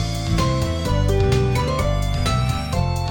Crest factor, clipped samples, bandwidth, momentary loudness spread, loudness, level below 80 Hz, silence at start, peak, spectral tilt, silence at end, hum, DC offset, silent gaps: 14 dB; under 0.1%; 18.5 kHz; 4 LU; -21 LUFS; -26 dBFS; 0 s; -6 dBFS; -6 dB/octave; 0 s; none; under 0.1%; none